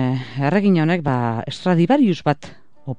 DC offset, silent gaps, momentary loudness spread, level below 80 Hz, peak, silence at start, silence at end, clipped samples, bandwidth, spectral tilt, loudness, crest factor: 0.9%; none; 8 LU; -56 dBFS; -2 dBFS; 0 s; 0.05 s; under 0.1%; 9.4 kHz; -8 dB/octave; -19 LUFS; 16 dB